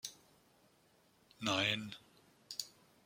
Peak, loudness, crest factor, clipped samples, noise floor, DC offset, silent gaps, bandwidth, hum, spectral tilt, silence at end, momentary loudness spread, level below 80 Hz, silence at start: -18 dBFS; -38 LUFS; 26 dB; under 0.1%; -71 dBFS; under 0.1%; none; 16.5 kHz; none; -2.5 dB/octave; 0.35 s; 19 LU; -80 dBFS; 0.05 s